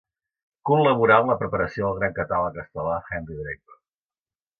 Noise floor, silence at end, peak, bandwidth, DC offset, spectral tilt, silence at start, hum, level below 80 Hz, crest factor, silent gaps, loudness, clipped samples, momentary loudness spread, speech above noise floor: under -90 dBFS; 1.05 s; -4 dBFS; 6.6 kHz; under 0.1%; -8.5 dB/octave; 0.65 s; none; -50 dBFS; 20 dB; none; -23 LUFS; under 0.1%; 16 LU; over 67 dB